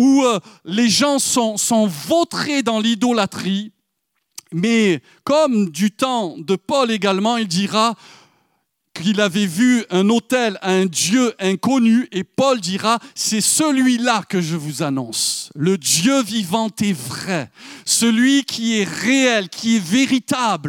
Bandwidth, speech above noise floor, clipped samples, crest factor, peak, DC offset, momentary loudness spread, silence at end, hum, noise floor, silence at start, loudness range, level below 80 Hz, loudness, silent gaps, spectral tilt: 17.5 kHz; 55 dB; under 0.1%; 16 dB; -2 dBFS; under 0.1%; 8 LU; 0 s; none; -73 dBFS; 0 s; 3 LU; -68 dBFS; -17 LUFS; none; -3.5 dB/octave